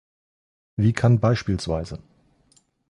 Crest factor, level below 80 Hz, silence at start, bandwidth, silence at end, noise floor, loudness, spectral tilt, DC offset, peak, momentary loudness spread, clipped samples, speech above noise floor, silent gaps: 18 dB; -44 dBFS; 0.8 s; 11 kHz; 0.9 s; -62 dBFS; -22 LUFS; -7.5 dB/octave; under 0.1%; -6 dBFS; 17 LU; under 0.1%; 41 dB; none